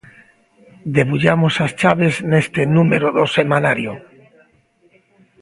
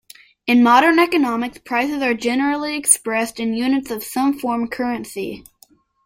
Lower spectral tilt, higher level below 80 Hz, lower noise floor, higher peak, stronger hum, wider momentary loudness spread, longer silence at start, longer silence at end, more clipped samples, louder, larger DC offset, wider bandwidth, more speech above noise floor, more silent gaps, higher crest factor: first, -6.5 dB/octave vs -2.5 dB/octave; about the same, -52 dBFS vs -56 dBFS; about the same, -57 dBFS vs -54 dBFS; about the same, 0 dBFS vs 0 dBFS; neither; second, 7 LU vs 13 LU; first, 0.85 s vs 0.45 s; first, 1.4 s vs 0.65 s; neither; about the same, -16 LUFS vs -18 LUFS; neither; second, 11.5 kHz vs 16.5 kHz; first, 41 dB vs 36 dB; neither; about the same, 18 dB vs 18 dB